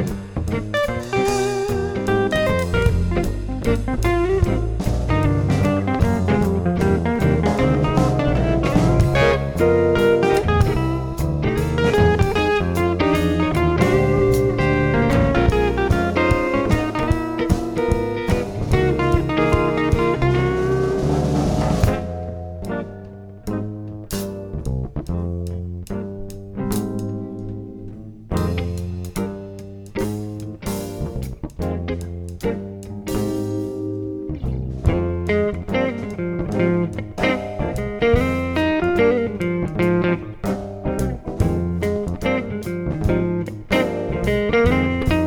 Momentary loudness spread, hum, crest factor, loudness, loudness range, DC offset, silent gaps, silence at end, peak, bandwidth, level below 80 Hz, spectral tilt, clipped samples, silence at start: 12 LU; none; 16 dB; -20 LUFS; 10 LU; under 0.1%; none; 0 s; -2 dBFS; 19.5 kHz; -30 dBFS; -7 dB/octave; under 0.1%; 0 s